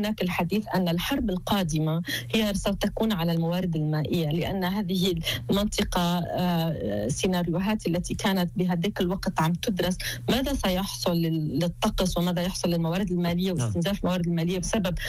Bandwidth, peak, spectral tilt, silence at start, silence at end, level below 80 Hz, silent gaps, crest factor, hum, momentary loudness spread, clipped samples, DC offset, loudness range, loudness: 16 kHz; -14 dBFS; -5.5 dB/octave; 0 s; 0 s; -42 dBFS; none; 12 dB; none; 2 LU; under 0.1%; under 0.1%; 0 LU; -26 LUFS